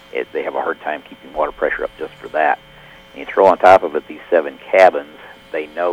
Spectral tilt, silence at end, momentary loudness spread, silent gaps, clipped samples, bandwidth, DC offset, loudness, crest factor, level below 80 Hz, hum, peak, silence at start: -5 dB/octave; 0 s; 17 LU; none; 0.1%; 11 kHz; under 0.1%; -16 LUFS; 18 dB; -52 dBFS; none; 0 dBFS; 0.15 s